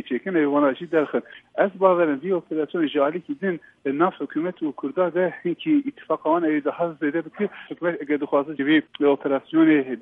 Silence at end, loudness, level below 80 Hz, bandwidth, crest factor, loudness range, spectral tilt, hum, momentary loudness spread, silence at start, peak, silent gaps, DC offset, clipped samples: 0 s; -23 LUFS; -76 dBFS; 3.9 kHz; 18 dB; 2 LU; -9 dB/octave; none; 9 LU; 0.05 s; -4 dBFS; none; under 0.1%; under 0.1%